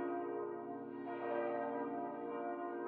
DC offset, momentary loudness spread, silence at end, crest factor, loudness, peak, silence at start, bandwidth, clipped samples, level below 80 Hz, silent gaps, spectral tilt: under 0.1%; 6 LU; 0 s; 14 dB; -42 LUFS; -26 dBFS; 0 s; 4.2 kHz; under 0.1%; under -90 dBFS; none; -5.5 dB/octave